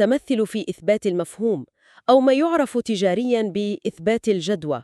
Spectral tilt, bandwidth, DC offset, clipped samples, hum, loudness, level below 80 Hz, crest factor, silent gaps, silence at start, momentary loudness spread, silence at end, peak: -5.5 dB/octave; 12.5 kHz; under 0.1%; under 0.1%; none; -21 LUFS; -62 dBFS; 18 dB; none; 0 s; 8 LU; 0 s; -4 dBFS